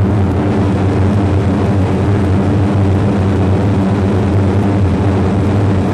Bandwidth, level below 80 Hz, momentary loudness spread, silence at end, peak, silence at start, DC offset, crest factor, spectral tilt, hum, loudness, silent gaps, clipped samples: 9.4 kHz; -30 dBFS; 1 LU; 0 s; -2 dBFS; 0 s; under 0.1%; 10 dB; -8.5 dB/octave; none; -13 LUFS; none; under 0.1%